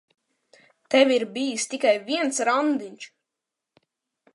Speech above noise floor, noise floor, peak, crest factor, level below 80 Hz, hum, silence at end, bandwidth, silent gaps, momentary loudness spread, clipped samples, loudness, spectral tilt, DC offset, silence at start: 63 dB; -86 dBFS; -4 dBFS; 22 dB; -84 dBFS; none; 1.3 s; 11.5 kHz; none; 16 LU; under 0.1%; -23 LUFS; -2 dB/octave; under 0.1%; 0.9 s